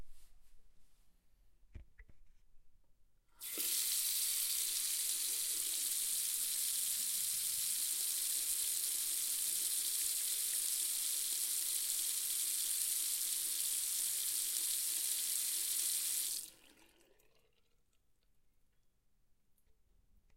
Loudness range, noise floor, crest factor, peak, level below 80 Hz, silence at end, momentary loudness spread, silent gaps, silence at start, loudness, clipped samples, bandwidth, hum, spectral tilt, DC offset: 5 LU; -76 dBFS; 22 dB; -18 dBFS; -70 dBFS; 3.8 s; 1 LU; none; 0 s; -35 LUFS; under 0.1%; 16.5 kHz; none; 3 dB/octave; under 0.1%